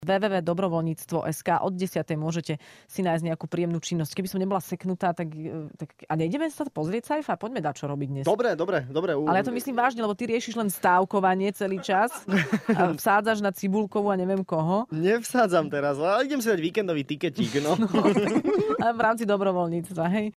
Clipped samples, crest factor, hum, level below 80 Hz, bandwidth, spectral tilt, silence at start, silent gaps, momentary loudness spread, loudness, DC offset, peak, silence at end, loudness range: under 0.1%; 18 dB; none; -66 dBFS; 16 kHz; -6 dB/octave; 0 s; none; 8 LU; -26 LUFS; under 0.1%; -8 dBFS; 0.05 s; 5 LU